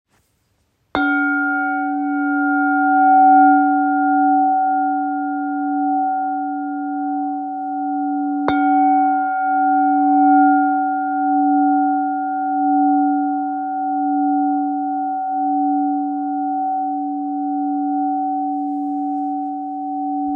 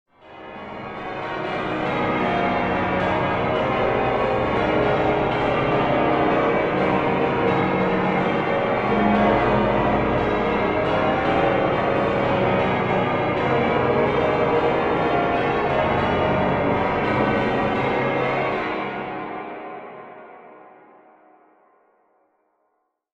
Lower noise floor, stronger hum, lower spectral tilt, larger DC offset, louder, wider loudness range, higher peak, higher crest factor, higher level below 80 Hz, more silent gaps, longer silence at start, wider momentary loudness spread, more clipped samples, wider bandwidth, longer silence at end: second, -65 dBFS vs -72 dBFS; neither; about the same, -7.5 dB/octave vs -7.5 dB/octave; neither; first, -18 LUFS vs -21 LUFS; about the same, 7 LU vs 5 LU; first, -2 dBFS vs -6 dBFS; about the same, 16 dB vs 16 dB; second, -64 dBFS vs -42 dBFS; neither; first, 0.95 s vs 0.25 s; about the same, 10 LU vs 10 LU; neither; second, 4.4 kHz vs 8.2 kHz; second, 0 s vs 2.55 s